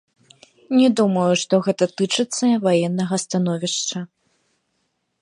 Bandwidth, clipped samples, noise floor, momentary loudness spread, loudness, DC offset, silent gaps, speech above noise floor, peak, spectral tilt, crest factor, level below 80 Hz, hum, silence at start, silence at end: 11 kHz; under 0.1%; -71 dBFS; 6 LU; -19 LUFS; under 0.1%; none; 53 dB; -4 dBFS; -5 dB/octave; 16 dB; -70 dBFS; none; 0.7 s; 1.15 s